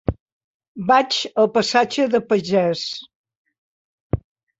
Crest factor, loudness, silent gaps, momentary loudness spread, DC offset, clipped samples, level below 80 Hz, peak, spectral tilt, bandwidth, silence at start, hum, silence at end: 18 dB; -20 LUFS; 0.20-0.26 s, 0.32-0.60 s, 0.68-0.75 s, 3.15-3.24 s, 3.36-3.45 s, 3.58-4.10 s; 12 LU; under 0.1%; under 0.1%; -42 dBFS; -4 dBFS; -4.5 dB/octave; 8.2 kHz; 0.1 s; none; 0.4 s